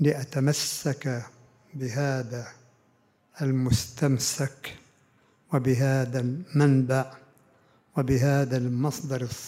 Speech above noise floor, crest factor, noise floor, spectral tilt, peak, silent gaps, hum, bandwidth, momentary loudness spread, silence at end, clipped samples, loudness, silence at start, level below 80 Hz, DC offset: 40 dB; 18 dB; -65 dBFS; -5.5 dB/octave; -8 dBFS; none; none; 16 kHz; 13 LU; 0 s; under 0.1%; -26 LUFS; 0 s; -54 dBFS; under 0.1%